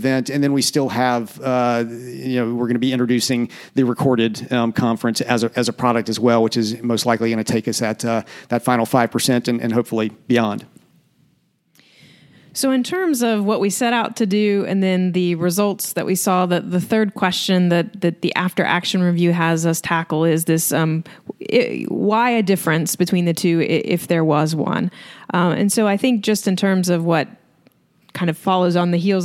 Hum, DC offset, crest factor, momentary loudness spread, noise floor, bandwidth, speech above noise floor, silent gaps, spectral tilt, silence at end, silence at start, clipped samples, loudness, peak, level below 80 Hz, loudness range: none; under 0.1%; 18 dB; 5 LU; -62 dBFS; 16.5 kHz; 44 dB; none; -5 dB/octave; 0 s; 0 s; under 0.1%; -18 LUFS; 0 dBFS; -64 dBFS; 2 LU